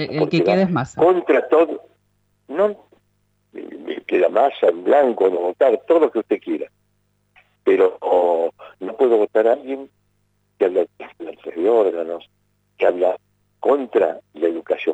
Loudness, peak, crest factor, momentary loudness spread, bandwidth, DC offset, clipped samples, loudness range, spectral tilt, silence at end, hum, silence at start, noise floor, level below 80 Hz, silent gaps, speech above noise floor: -19 LUFS; -4 dBFS; 14 dB; 16 LU; 8 kHz; under 0.1%; under 0.1%; 4 LU; -7.5 dB/octave; 0 s; 50 Hz at -65 dBFS; 0 s; -66 dBFS; -66 dBFS; none; 48 dB